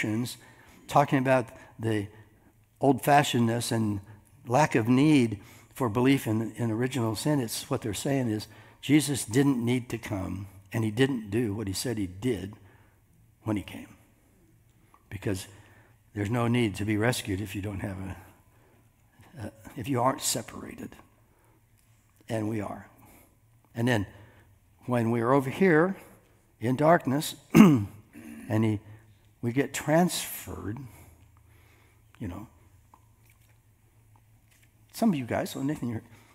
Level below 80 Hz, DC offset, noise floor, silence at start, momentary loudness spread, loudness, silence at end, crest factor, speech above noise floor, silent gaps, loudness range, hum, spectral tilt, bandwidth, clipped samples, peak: -62 dBFS; under 0.1%; -62 dBFS; 0 s; 19 LU; -27 LUFS; 0.35 s; 26 dB; 36 dB; none; 13 LU; none; -5.5 dB/octave; 16 kHz; under 0.1%; -2 dBFS